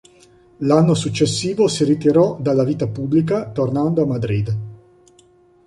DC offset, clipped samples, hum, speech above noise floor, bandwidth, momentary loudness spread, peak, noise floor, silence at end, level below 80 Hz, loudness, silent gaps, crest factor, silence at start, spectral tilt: under 0.1%; under 0.1%; none; 35 dB; 11.5 kHz; 8 LU; -2 dBFS; -52 dBFS; 0.9 s; -50 dBFS; -18 LUFS; none; 16 dB; 0.6 s; -6.5 dB/octave